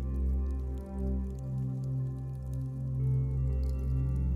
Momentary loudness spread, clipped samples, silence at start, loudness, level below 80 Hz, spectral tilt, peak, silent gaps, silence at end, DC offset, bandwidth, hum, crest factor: 6 LU; under 0.1%; 0 s; -34 LUFS; -34 dBFS; -10.5 dB/octave; -22 dBFS; none; 0 s; under 0.1%; 2.9 kHz; none; 10 dB